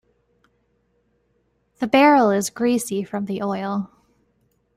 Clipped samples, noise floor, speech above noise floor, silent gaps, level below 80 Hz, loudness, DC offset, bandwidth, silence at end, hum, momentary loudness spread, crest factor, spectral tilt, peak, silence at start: under 0.1%; -67 dBFS; 48 dB; none; -64 dBFS; -20 LUFS; under 0.1%; 15.5 kHz; 0.9 s; none; 14 LU; 20 dB; -5 dB/octave; -2 dBFS; 1.8 s